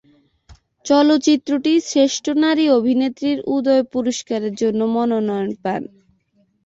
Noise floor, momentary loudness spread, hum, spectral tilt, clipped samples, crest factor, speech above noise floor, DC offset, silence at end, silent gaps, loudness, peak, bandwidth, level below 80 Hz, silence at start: -62 dBFS; 9 LU; none; -4.5 dB/octave; under 0.1%; 14 dB; 45 dB; under 0.1%; 0.8 s; none; -18 LUFS; -4 dBFS; 8 kHz; -60 dBFS; 0.5 s